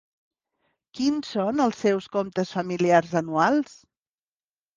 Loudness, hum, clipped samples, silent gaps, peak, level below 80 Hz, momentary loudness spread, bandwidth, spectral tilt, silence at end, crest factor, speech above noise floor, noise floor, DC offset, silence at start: -24 LUFS; none; under 0.1%; none; -6 dBFS; -66 dBFS; 7 LU; 9.6 kHz; -6 dB/octave; 1.15 s; 20 dB; over 66 dB; under -90 dBFS; under 0.1%; 0.95 s